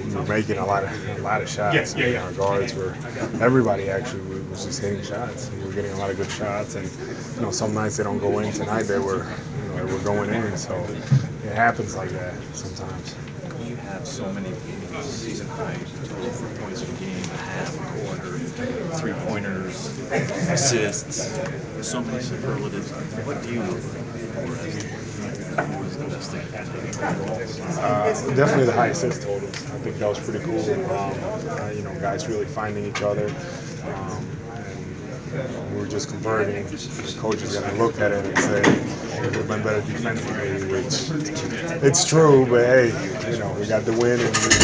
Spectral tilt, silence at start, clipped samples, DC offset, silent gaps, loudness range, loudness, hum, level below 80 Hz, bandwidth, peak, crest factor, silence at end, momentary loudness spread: -4.5 dB/octave; 0 s; under 0.1%; under 0.1%; none; 10 LU; -24 LUFS; none; -48 dBFS; 8 kHz; -2 dBFS; 22 dB; 0 s; 12 LU